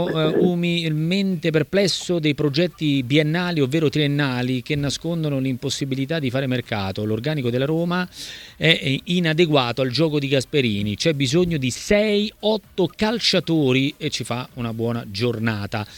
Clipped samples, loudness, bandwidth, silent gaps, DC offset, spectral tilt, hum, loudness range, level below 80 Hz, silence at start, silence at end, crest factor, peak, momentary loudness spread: under 0.1%; -21 LUFS; 18.5 kHz; none; under 0.1%; -5.5 dB/octave; none; 4 LU; -50 dBFS; 0 s; 0 s; 20 dB; 0 dBFS; 7 LU